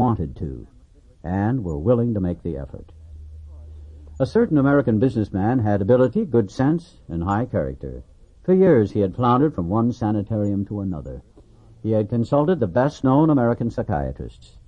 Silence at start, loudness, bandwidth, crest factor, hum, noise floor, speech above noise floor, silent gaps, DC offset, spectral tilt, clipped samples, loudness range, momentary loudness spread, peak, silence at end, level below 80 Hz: 0 s; -21 LUFS; 8.8 kHz; 16 dB; none; -50 dBFS; 30 dB; none; under 0.1%; -9.5 dB/octave; under 0.1%; 5 LU; 20 LU; -4 dBFS; 0.1 s; -42 dBFS